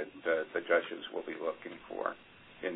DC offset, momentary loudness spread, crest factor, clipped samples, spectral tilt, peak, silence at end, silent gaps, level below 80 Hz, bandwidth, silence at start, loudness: under 0.1%; 14 LU; 20 dB; under 0.1%; 2 dB/octave; -16 dBFS; 0 s; none; -74 dBFS; 3.9 kHz; 0 s; -36 LUFS